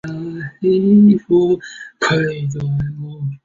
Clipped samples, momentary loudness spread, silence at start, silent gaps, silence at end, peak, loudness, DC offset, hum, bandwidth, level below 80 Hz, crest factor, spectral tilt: under 0.1%; 16 LU; 0.05 s; none; 0.1 s; -2 dBFS; -16 LUFS; under 0.1%; none; 7.6 kHz; -48 dBFS; 14 dB; -7.5 dB/octave